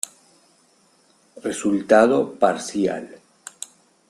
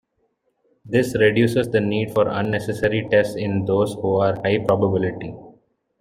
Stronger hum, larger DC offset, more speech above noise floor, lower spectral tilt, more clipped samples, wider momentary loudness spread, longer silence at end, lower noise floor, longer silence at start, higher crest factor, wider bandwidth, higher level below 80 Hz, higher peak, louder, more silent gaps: neither; neither; second, 40 dB vs 49 dB; second, -4.5 dB/octave vs -7 dB/octave; neither; first, 23 LU vs 6 LU; first, 1 s vs 0.5 s; second, -59 dBFS vs -69 dBFS; first, 1.35 s vs 0.85 s; about the same, 20 dB vs 18 dB; second, 14 kHz vs 16 kHz; second, -64 dBFS vs -52 dBFS; about the same, -2 dBFS vs -4 dBFS; about the same, -20 LUFS vs -20 LUFS; neither